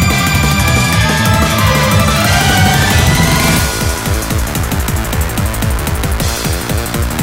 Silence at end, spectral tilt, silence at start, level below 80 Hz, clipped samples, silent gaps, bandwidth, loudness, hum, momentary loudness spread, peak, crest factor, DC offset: 0 s; -4 dB/octave; 0 s; -20 dBFS; under 0.1%; none; 16.5 kHz; -12 LUFS; none; 6 LU; 0 dBFS; 12 dB; under 0.1%